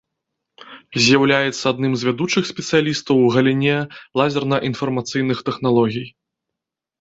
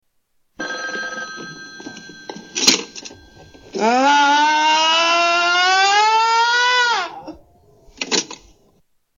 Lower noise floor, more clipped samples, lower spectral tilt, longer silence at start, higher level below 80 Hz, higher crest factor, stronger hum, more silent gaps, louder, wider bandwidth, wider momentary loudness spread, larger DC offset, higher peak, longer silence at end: first, -85 dBFS vs -65 dBFS; neither; first, -5 dB/octave vs -0.5 dB/octave; about the same, 0.6 s vs 0.6 s; about the same, -58 dBFS vs -60 dBFS; about the same, 18 dB vs 18 dB; neither; neither; second, -18 LUFS vs -15 LUFS; second, 8 kHz vs 17 kHz; second, 8 LU vs 21 LU; neither; about the same, -2 dBFS vs 0 dBFS; about the same, 0.9 s vs 0.85 s